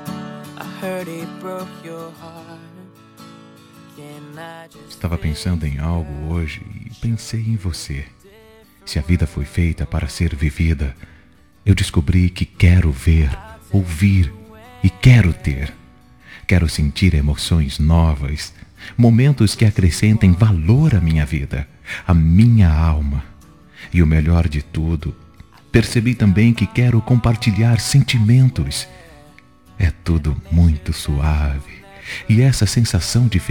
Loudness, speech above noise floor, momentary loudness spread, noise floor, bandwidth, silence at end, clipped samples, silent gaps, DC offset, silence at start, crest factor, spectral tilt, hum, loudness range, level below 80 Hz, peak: -17 LUFS; 34 dB; 17 LU; -49 dBFS; 17 kHz; 0 s; under 0.1%; none; 0.2%; 0 s; 16 dB; -6.5 dB/octave; none; 11 LU; -28 dBFS; 0 dBFS